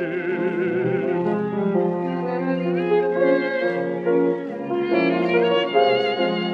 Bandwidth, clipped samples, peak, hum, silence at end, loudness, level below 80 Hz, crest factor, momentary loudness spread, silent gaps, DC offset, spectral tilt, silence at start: 6 kHz; under 0.1%; -4 dBFS; none; 0 s; -21 LUFS; -70 dBFS; 16 dB; 6 LU; none; under 0.1%; -8 dB/octave; 0 s